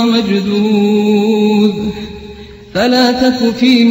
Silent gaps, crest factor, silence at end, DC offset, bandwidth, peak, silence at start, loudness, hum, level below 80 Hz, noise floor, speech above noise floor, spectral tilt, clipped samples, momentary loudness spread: none; 12 dB; 0 s; under 0.1%; 16.5 kHz; 0 dBFS; 0 s; -12 LUFS; none; -42 dBFS; -32 dBFS; 21 dB; -6 dB/octave; under 0.1%; 14 LU